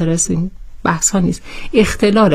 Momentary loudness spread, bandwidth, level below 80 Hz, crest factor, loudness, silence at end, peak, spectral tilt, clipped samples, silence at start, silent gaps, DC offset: 9 LU; 15.5 kHz; -32 dBFS; 14 dB; -15 LUFS; 0 s; 0 dBFS; -4.5 dB/octave; under 0.1%; 0 s; none; under 0.1%